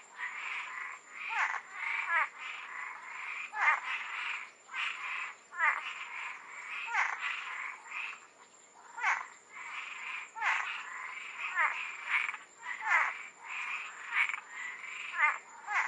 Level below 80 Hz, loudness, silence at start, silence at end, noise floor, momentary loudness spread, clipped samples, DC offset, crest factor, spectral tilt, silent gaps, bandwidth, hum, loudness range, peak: under -90 dBFS; -35 LUFS; 0 s; 0 s; -59 dBFS; 12 LU; under 0.1%; under 0.1%; 22 dB; 2 dB/octave; none; 11.5 kHz; none; 4 LU; -14 dBFS